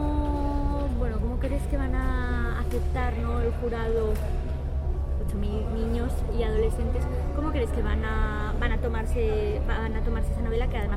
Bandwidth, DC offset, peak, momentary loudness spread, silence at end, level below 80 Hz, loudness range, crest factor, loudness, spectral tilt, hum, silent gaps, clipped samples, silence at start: 12.5 kHz; under 0.1%; -12 dBFS; 3 LU; 0 s; -28 dBFS; 1 LU; 14 dB; -29 LUFS; -7.5 dB/octave; none; none; under 0.1%; 0 s